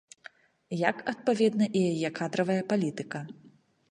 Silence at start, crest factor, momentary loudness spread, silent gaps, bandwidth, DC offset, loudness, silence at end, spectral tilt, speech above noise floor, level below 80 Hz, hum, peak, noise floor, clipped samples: 0.7 s; 22 dB; 14 LU; none; 10.5 kHz; under 0.1%; -29 LUFS; 0.45 s; -6 dB/octave; 26 dB; -74 dBFS; none; -8 dBFS; -54 dBFS; under 0.1%